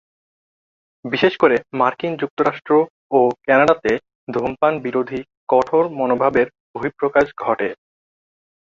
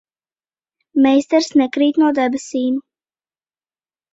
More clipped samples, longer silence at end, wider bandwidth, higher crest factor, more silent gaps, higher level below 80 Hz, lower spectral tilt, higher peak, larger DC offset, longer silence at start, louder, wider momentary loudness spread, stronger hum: neither; second, 0.9 s vs 1.35 s; about the same, 7.4 kHz vs 8 kHz; about the same, 18 dB vs 16 dB; first, 2.30-2.37 s, 2.90-3.10 s, 4.15-4.27 s, 5.37-5.47 s, 6.60-6.74 s vs none; first, -56 dBFS vs -64 dBFS; first, -6.5 dB/octave vs -3.5 dB/octave; about the same, -2 dBFS vs -2 dBFS; neither; about the same, 1.05 s vs 0.95 s; second, -19 LUFS vs -16 LUFS; first, 10 LU vs 7 LU; neither